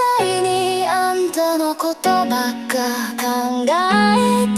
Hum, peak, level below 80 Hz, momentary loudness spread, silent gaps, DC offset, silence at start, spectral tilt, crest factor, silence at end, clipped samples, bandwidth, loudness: none; -2 dBFS; -58 dBFS; 6 LU; none; under 0.1%; 0 s; -4 dB/octave; 14 dB; 0 s; under 0.1%; 16 kHz; -18 LUFS